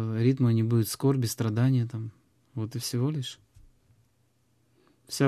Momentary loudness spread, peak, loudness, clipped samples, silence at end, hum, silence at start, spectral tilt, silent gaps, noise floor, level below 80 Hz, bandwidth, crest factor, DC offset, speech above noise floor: 15 LU; -12 dBFS; -28 LUFS; under 0.1%; 0 s; none; 0 s; -6.5 dB/octave; none; -69 dBFS; -62 dBFS; 14.5 kHz; 16 dB; under 0.1%; 43 dB